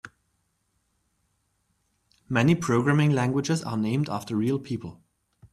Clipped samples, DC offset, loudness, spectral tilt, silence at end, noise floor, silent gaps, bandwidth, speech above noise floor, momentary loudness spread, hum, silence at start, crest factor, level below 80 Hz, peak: under 0.1%; under 0.1%; -25 LUFS; -6.5 dB/octave; 0.6 s; -73 dBFS; none; 13.5 kHz; 49 dB; 9 LU; none; 0.05 s; 20 dB; -62 dBFS; -8 dBFS